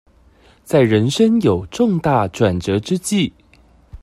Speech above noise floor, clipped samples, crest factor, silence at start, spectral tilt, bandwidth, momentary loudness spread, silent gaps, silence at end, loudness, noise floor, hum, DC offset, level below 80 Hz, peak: 35 dB; under 0.1%; 16 dB; 0.7 s; -6 dB/octave; 14 kHz; 5 LU; none; 0.05 s; -17 LUFS; -50 dBFS; none; under 0.1%; -46 dBFS; 0 dBFS